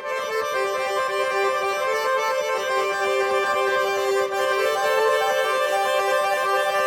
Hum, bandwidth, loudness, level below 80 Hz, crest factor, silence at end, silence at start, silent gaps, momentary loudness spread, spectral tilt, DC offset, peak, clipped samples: none; 18 kHz; -22 LUFS; -66 dBFS; 12 dB; 0 s; 0 s; none; 3 LU; -1.5 dB/octave; under 0.1%; -10 dBFS; under 0.1%